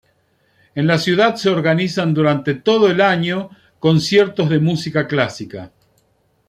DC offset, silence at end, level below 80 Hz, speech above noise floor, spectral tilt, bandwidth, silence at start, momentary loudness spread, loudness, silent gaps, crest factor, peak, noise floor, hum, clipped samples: under 0.1%; 0.8 s; -56 dBFS; 45 dB; -6 dB/octave; 13 kHz; 0.75 s; 11 LU; -16 LUFS; none; 16 dB; -2 dBFS; -61 dBFS; none; under 0.1%